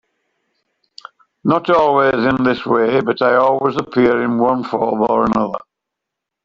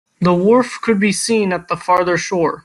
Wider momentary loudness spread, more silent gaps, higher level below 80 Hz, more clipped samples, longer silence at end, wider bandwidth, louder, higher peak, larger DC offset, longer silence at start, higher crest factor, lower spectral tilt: about the same, 5 LU vs 5 LU; neither; about the same, -52 dBFS vs -54 dBFS; neither; first, 0.85 s vs 0.05 s; second, 7.4 kHz vs 12.5 kHz; about the same, -15 LUFS vs -16 LUFS; about the same, -2 dBFS vs -2 dBFS; neither; first, 1.45 s vs 0.2 s; about the same, 14 dB vs 14 dB; first, -7.5 dB/octave vs -5 dB/octave